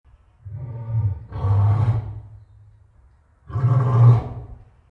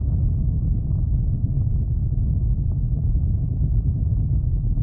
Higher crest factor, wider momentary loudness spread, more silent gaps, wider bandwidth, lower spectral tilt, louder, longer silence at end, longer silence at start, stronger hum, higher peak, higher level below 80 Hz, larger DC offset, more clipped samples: first, 18 dB vs 10 dB; first, 21 LU vs 1 LU; neither; first, 3.9 kHz vs 1.2 kHz; second, -10.5 dB/octave vs -16 dB/octave; first, -20 LUFS vs -23 LUFS; first, 0.35 s vs 0 s; first, 0.45 s vs 0 s; neither; first, -4 dBFS vs -10 dBFS; second, -42 dBFS vs -22 dBFS; neither; neither